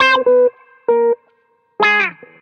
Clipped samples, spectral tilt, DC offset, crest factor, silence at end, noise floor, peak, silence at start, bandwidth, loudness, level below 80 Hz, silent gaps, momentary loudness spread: under 0.1%; -3 dB/octave; under 0.1%; 14 dB; 0.3 s; -59 dBFS; -2 dBFS; 0 s; 6.6 kHz; -15 LUFS; -68 dBFS; none; 10 LU